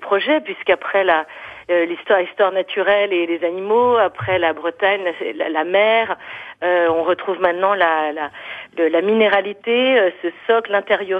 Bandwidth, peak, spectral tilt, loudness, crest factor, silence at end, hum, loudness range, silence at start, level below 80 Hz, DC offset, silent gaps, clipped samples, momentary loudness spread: 4.9 kHz; -4 dBFS; -6.5 dB/octave; -18 LUFS; 14 dB; 0 s; none; 1 LU; 0 s; -62 dBFS; under 0.1%; none; under 0.1%; 9 LU